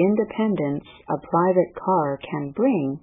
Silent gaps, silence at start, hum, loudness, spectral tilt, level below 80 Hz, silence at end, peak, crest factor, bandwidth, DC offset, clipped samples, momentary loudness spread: none; 0 s; none; -23 LUFS; -12 dB/octave; -60 dBFS; 0.05 s; -8 dBFS; 16 dB; 3.8 kHz; under 0.1%; under 0.1%; 10 LU